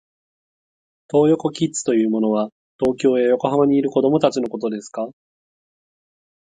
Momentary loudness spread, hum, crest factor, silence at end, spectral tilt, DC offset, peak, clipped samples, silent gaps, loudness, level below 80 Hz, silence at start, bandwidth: 10 LU; none; 20 dB; 1.4 s; -6 dB/octave; under 0.1%; -2 dBFS; under 0.1%; 2.52-2.79 s; -19 LUFS; -60 dBFS; 1.15 s; 9.6 kHz